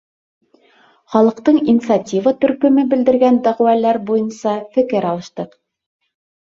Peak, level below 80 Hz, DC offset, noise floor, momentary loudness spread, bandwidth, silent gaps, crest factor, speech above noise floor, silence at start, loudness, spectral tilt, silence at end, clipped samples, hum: 0 dBFS; -60 dBFS; under 0.1%; -53 dBFS; 9 LU; 7.6 kHz; none; 16 dB; 38 dB; 1.1 s; -15 LUFS; -7 dB/octave; 1.05 s; under 0.1%; none